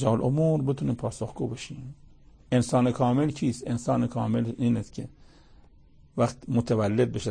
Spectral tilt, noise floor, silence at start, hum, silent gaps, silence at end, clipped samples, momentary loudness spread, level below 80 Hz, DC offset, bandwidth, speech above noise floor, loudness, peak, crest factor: -7.5 dB/octave; -54 dBFS; 0 s; none; none; 0 s; under 0.1%; 14 LU; -52 dBFS; under 0.1%; 9.8 kHz; 29 dB; -27 LUFS; -10 dBFS; 16 dB